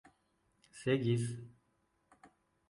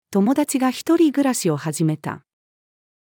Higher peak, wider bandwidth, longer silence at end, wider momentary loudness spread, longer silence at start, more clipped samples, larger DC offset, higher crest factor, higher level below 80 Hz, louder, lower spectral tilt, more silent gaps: second, -20 dBFS vs -6 dBFS; second, 11.5 kHz vs 18.5 kHz; second, 0.45 s vs 0.85 s; first, 25 LU vs 11 LU; first, 0.75 s vs 0.1 s; neither; neither; first, 20 dB vs 14 dB; about the same, -74 dBFS vs -72 dBFS; second, -35 LUFS vs -20 LUFS; about the same, -6.5 dB/octave vs -5.5 dB/octave; neither